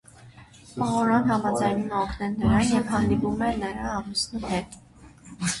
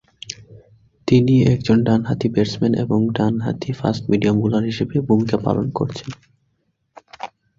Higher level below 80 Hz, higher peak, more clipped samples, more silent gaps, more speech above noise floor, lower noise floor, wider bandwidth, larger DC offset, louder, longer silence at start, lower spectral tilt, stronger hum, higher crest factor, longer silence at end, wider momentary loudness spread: about the same, -44 dBFS vs -46 dBFS; second, -8 dBFS vs -2 dBFS; neither; neither; second, 25 dB vs 51 dB; second, -49 dBFS vs -68 dBFS; first, 11.5 kHz vs 7.6 kHz; neither; second, -25 LUFS vs -19 LUFS; about the same, 0.2 s vs 0.3 s; second, -5 dB/octave vs -7.5 dB/octave; neither; about the same, 16 dB vs 16 dB; second, 0 s vs 0.3 s; second, 9 LU vs 18 LU